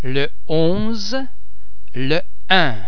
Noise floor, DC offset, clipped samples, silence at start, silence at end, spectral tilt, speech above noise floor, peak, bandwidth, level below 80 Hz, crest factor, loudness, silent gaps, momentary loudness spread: -44 dBFS; 20%; under 0.1%; 0 s; 0 s; -5.5 dB/octave; 24 dB; 0 dBFS; 5.4 kHz; -42 dBFS; 22 dB; -20 LUFS; none; 11 LU